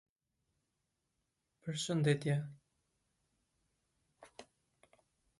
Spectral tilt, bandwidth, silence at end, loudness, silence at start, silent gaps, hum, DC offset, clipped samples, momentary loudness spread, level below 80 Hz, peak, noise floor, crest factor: -5.5 dB/octave; 11.5 kHz; 0.95 s; -36 LUFS; 1.65 s; none; none; under 0.1%; under 0.1%; 24 LU; -78 dBFS; -20 dBFS; -85 dBFS; 22 dB